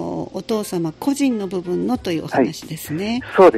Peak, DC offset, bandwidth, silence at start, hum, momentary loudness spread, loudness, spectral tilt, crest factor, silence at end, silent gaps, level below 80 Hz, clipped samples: 0 dBFS; under 0.1%; 15 kHz; 0 s; none; 7 LU; -21 LUFS; -5.5 dB/octave; 18 dB; 0 s; none; -52 dBFS; under 0.1%